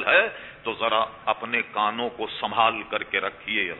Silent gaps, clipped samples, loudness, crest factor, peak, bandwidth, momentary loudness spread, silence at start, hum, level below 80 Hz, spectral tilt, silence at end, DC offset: none; under 0.1%; -25 LUFS; 20 dB; -4 dBFS; 4.2 kHz; 8 LU; 0 s; none; -62 dBFS; -6.5 dB/octave; 0 s; under 0.1%